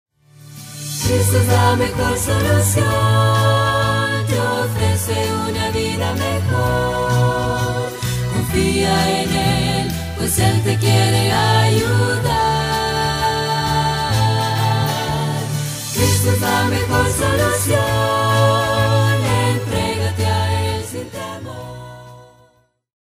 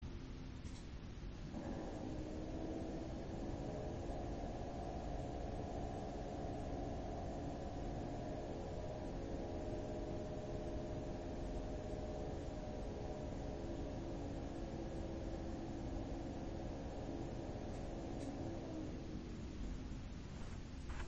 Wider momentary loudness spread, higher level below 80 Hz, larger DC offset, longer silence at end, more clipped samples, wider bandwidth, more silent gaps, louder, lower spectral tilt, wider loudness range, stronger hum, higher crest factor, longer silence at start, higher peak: first, 8 LU vs 4 LU; first, -36 dBFS vs -50 dBFS; neither; first, 0.8 s vs 0 s; neither; first, 16 kHz vs 8.2 kHz; neither; first, -17 LUFS vs -47 LUFS; second, -4.5 dB/octave vs -7 dB/octave; about the same, 3 LU vs 1 LU; neither; about the same, 16 dB vs 14 dB; first, 0.45 s vs 0 s; first, -2 dBFS vs -32 dBFS